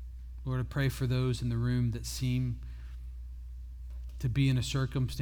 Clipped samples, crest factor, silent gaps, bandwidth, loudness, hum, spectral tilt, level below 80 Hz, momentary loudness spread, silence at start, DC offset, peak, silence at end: under 0.1%; 16 dB; none; 17.5 kHz; -32 LUFS; none; -6 dB/octave; -42 dBFS; 17 LU; 0 s; under 0.1%; -16 dBFS; 0 s